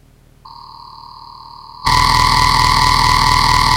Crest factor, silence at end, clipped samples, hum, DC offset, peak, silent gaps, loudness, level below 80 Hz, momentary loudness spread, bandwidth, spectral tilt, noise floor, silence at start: 14 dB; 0 s; under 0.1%; none; under 0.1%; 0 dBFS; none; -11 LUFS; -26 dBFS; 3 LU; 17 kHz; -2.5 dB/octave; -43 dBFS; 0.45 s